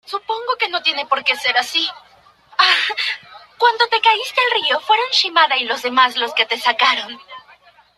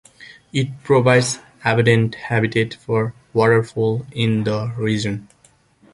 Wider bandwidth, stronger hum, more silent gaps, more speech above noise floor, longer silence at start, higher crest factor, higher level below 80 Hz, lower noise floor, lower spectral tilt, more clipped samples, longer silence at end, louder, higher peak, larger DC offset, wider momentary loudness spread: first, 14 kHz vs 11.5 kHz; neither; neither; second, 32 dB vs 37 dB; about the same, 0.1 s vs 0.2 s; about the same, 18 dB vs 18 dB; second, -70 dBFS vs -52 dBFS; second, -49 dBFS vs -55 dBFS; second, 0.5 dB/octave vs -6 dB/octave; neither; about the same, 0.6 s vs 0.7 s; first, -16 LUFS vs -19 LUFS; about the same, 0 dBFS vs -2 dBFS; neither; about the same, 9 LU vs 8 LU